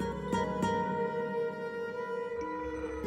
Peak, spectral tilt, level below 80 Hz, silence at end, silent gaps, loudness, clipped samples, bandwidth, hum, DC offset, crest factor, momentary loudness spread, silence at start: -20 dBFS; -6.5 dB/octave; -54 dBFS; 0 s; none; -34 LUFS; under 0.1%; 15 kHz; none; under 0.1%; 14 dB; 6 LU; 0 s